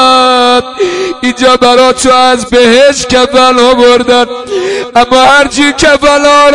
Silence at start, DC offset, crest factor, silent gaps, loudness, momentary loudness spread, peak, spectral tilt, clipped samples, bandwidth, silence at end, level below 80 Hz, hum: 0 s; 1%; 6 dB; none; -6 LUFS; 8 LU; 0 dBFS; -2.5 dB/octave; 5%; 12 kHz; 0 s; -34 dBFS; none